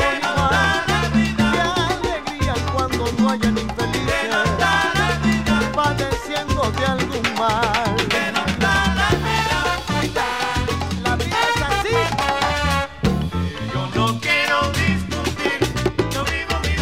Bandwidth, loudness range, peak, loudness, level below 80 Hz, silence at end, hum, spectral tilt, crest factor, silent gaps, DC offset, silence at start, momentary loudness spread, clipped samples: 16 kHz; 1 LU; -4 dBFS; -19 LUFS; -32 dBFS; 0 s; none; -4.5 dB/octave; 16 dB; none; 0.6%; 0 s; 5 LU; under 0.1%